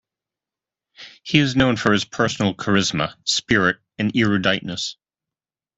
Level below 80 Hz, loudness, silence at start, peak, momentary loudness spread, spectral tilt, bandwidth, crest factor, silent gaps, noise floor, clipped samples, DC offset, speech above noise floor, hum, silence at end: -52 dBFS; -20 LUFS; 1 s; 0 dBFS; 8 LU; -4.5 dB/octave; 8.4 kHz; 22 dB; none; -90 dBFS; under 0.1%; under 0.1%; 70 dB; none; 0.85 s